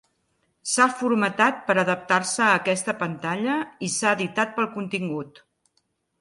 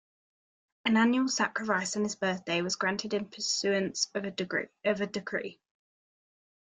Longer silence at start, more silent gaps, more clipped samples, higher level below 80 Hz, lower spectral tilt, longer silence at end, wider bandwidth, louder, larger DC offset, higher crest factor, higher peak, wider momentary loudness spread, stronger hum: second, 0.65 s vs 0.85 s; neither; neither; about the same, -70 dBFS vs -74 dBFS; about the same, -3.5 dB/octave vs -3.5 dB/octave; second, 0.9 s vs 1.05 s; first, 11.5 kHz vs 9.6 kHz; first, -23 LUFS vs -30 LUFS; neither; about the same, 20 dB vs 18 dB; first, -4 dBFS vs -12 dBFS; about the same, 8 LU vs 9 LU; neither